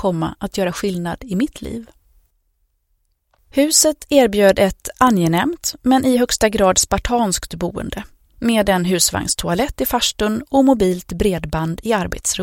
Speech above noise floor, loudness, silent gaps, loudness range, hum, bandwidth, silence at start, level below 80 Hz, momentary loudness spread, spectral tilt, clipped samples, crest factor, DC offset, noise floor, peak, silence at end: 49 dB; -17 LUFS; none; 5 LU; none; 17 kHz; 0 s; -36 dBFS; 10 LU; -4 dB/octave; under 0.1%; 18 dB; under 0.1%; -66 dBFS; 0 dBFS; 0 s